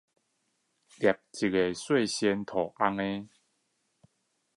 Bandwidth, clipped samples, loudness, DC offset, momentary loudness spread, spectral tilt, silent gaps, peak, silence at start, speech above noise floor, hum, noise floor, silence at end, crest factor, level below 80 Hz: 11.5 kHz; under 0.1%; -29 LUFS; under 0.1%; 5 LU; -4.5 dB/octave; none; -10 dBFS; 1 s; 48 dB; none; -77 dBFS; 1.3 s; 22 dB; -66 dBFS